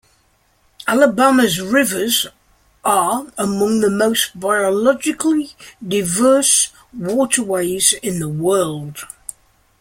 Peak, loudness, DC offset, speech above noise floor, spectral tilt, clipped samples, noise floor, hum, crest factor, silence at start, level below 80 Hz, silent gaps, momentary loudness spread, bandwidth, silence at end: 0 dBFS; -16 LUFS; under 0.1%; 42 dB; -3 dB/octave; under 0.1%; -59 dBFS; none; 18 dB; 0.8 s; -54 dBFS; none; 14 LU; 16.5 kHz; 0.75 s